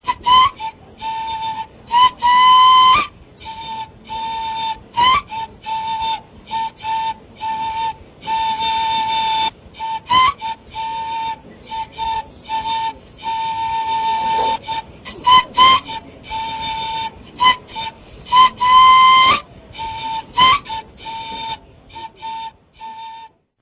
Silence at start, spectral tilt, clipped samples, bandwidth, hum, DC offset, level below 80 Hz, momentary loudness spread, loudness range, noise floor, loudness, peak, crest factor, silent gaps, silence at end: 0.05 s; -6 dB/octave; under 0.1%; 4 kHz; none; under 0.1%; -46 dBFS; 20 LU; 9 LU; -40 dBFS; -16 LUFS; 0 dBFS; 18 dB; none; 0.35 s